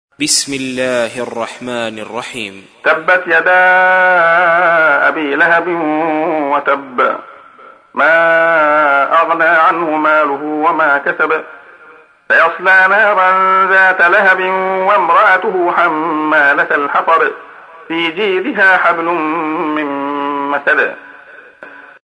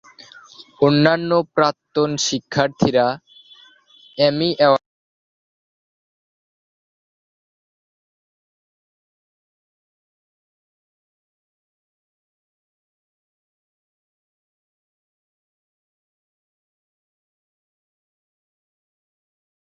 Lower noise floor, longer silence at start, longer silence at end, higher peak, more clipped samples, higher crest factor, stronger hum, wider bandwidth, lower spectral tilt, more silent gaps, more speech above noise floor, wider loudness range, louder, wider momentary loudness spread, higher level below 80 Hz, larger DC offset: second, -41 dBFS vs -51 dBFS; second, 0.2 s vs 0.6 s; second, 0.25 s vs 14.95 s; about the same, 0 dBFS vs 0 dBFS; neither; second, 12 dB vs 24 dB; neither; first, 11 kHz vs 7.8 kHz; second, -2.5 dB/octave vs -5 dB/octave; neither; second, 30 dB vs 34 dB; about the same, 4 LU vs 4 LU; first, -11 LUFS vs -18 LUFS; first, 11 LU vs 6 LU; about the same, -64 dBFS vs -62 dBFS; neither